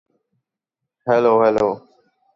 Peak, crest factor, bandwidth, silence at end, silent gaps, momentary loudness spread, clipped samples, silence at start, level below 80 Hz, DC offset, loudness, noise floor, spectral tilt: -4 dBFS; 16 dB; 7.6 kHz; 0.55 s; none; 15 LU; under 0.1%; 1.05 s; -58 dBFS; under 0.1%; -17 LUFS; -83 dBFS; -7 dB/octave